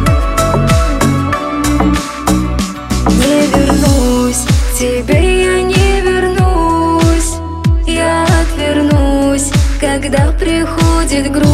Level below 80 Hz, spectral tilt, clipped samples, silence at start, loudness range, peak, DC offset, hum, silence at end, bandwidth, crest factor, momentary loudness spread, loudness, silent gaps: -16 dBFS; -5.5 dB/octave; under 0.1%; 0 s; 1 LU; 0 dBFS; under 0.1%; none; 0 s; 15.5 kHz; 10 dB; 4 LU; -12 LUFS; none